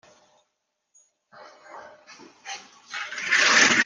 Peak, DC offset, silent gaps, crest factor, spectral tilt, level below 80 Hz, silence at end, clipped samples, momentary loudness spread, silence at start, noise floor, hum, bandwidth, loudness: -4 dBFS; under 0.1%; none; 22 dB; 0 dB/octave; -72 dBFS; 0 s; under 0.1%; 29 LU; 1.4 s; -78 dBFS; none; 10 kHz; -19 LUFS